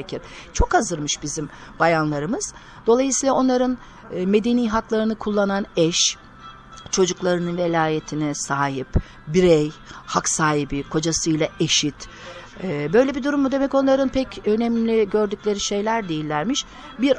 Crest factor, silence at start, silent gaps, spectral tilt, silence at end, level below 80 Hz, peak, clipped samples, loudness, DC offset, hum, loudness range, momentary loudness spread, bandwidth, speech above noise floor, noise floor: 18 dB; 0 s; none; -4 dB/octave; 0 s; -38 dBFS; -4 dBFS; under 0.1%; -21 LUFS; under 0.1%; none; 2 LU; 12 LU; 10.5 kHz; 21 dB; -42 dBFS